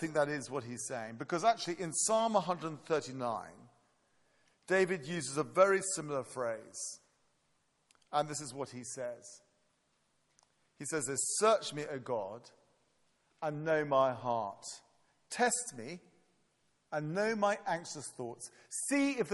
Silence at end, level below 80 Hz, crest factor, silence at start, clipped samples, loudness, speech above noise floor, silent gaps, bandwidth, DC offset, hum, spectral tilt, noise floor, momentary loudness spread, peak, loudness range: 0 s; -80 dBFS; 24 dB; 0 s; under 0.1%; -35 LUFS; 42 dB; none; 11.5 kHz; under 0.1%; none; -3.5 dB/octave; -76 dBFS; 15 LU; -12 dBFS; 7 LU